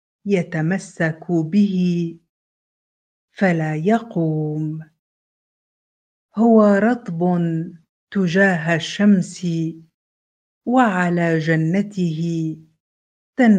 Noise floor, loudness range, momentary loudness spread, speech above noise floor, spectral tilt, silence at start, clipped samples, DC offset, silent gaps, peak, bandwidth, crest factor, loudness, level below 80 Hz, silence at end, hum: under -90 dBFS; 5 LU; 11 LU; over 72 dB; -7 dB/octave; 0.25 s; under 0.1%; under 0.1%; 2.29-3.28 s, 4.99-6.29 s, 7.89-8.07 s, 9.94-10.61 s, 12.80-13.33 s; -2 dBFS; 9.2 kHz; 18 dB; -19 LUFS; -66 dBFS; 0 s; none